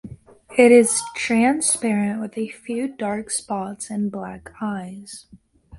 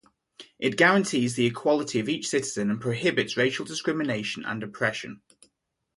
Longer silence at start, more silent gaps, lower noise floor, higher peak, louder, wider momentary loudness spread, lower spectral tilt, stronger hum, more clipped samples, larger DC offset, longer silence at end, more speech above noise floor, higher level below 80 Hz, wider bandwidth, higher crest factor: second, 0.05 s vs 0.4 s; neither; second, -42 dBFS vs -76 dBFS; first, 0 dBFS vs -6 dBFS; first, -20 LUFS vs -26 LUFS; first, 19 LU vs 10 LU; about the same, -4 dB/octave vs -4.5 dB/octave; neither; neither; neither; second, 0 s vs 0.8 s; second, 22 dB vs 50 dB; first, -58 dBFS vs -66 dBFS; about the same, 11.5 kHz vs 11.5 kHz; about the same, 20 dB vs 22 dB